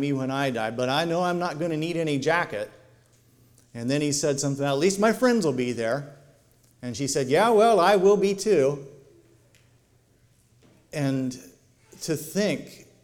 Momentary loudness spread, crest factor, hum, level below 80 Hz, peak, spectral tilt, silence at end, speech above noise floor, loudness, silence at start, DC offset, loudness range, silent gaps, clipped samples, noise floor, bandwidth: 17 LU; 18 dB; none; -62 dBFS; -8 dBFS; -5 dB/octave; 0.2 s; 38 dB; -24 LUFS; 0 s; under 0.1%; 9 LU; none; under 0.1%; -61 dBFS; 17.5 kHz